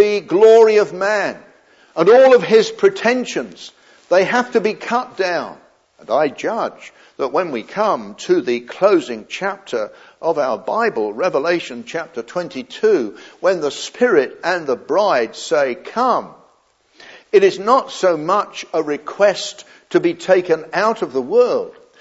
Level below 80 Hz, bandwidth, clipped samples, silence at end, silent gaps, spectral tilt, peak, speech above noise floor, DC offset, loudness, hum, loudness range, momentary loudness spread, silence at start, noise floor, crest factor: -72 dBFS; 8 kHz; under 0.1%; 0.3 s; none; -4.5 dB/octave; 0 dBFS; 41 dB; under 0.1%; -17 LUFS; none; 6 LU; 13 LU; 0 s; -57 dBFS; 16 dB